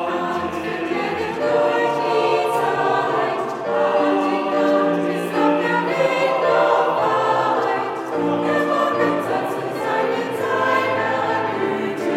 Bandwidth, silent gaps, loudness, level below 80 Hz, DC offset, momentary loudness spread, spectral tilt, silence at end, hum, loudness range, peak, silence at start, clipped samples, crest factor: 16 kHz; none; -20 LUFS; -62 dBFS; under 0.1%; 5 LU; -5.5 dB/octave; 0 s; none; 2 LU; -4 dBFS; 0 s; under 0.1%; 14 dB